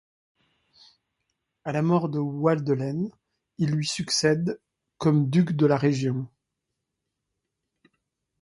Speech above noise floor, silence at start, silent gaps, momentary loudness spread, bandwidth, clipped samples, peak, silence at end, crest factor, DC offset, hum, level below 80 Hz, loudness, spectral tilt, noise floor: 59 dB; 1.65 s; none; 11 LU; 11.5 kHz; under 0.1%; -8 dBFS; 2.15 s; 20 dB; under 0.1%; none; -64 dBFS; -25 LUFS; -6 dB/octave; -82 dBFS